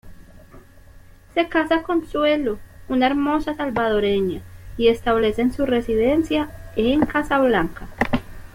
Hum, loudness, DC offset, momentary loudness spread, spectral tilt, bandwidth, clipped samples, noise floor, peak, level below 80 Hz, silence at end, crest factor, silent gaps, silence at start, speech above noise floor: none; -21 LUFS; under 0.1%; 8 LU; -6.5 dB/octave; 16.5 kHz; under 0.1%; -45 dBFS; -2 dBFS; -40 dBFS; 0.05 s; 18 dB; none; 0.05 s; 26 dB